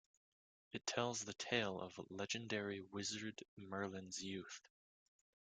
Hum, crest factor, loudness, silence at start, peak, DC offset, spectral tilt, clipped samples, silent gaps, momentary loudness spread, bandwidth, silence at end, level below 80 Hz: none; 26 dB; -45 LUFS; 0.75 s; -22 dBFS; under 0.1%; -3 dB/octave; under 0.1%; 3.48-3.57 s; 11 LU; 10 kHz; 1 s; -82 dBFS